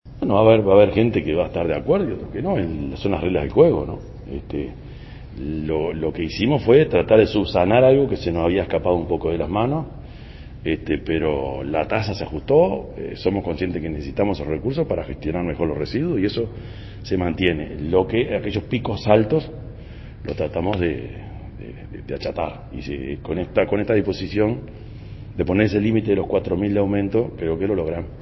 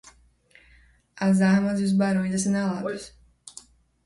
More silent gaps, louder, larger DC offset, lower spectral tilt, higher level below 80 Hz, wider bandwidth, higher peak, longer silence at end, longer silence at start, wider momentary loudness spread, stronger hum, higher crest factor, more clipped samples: neither; about the same, -21 LUFS vs -23 LUFS; neither; first, -8.5 dB/octave vs -6 dB/octave; first, -38 dBFS vs -58 dBFS; second, 6 kHz vs 11.5 kHz; first, 0 dBFS vs -10 dBFS; second, 0 s vs 0.55 s; second, 0.05 s vs 1.15 s; second, 19 LU vs 24 LU; neither; about the same, 20 dB vs 16 dB; neither